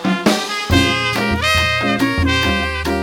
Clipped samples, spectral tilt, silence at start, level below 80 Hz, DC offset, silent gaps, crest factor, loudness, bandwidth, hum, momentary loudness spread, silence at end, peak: under 0.1%; -4.5 dB/octave; 0 s; -30 dBFS; under 0.1%; none; 16 dB; -16 LUFS; 18 kHz; none; 4 LU; 0 s; 0 dBFS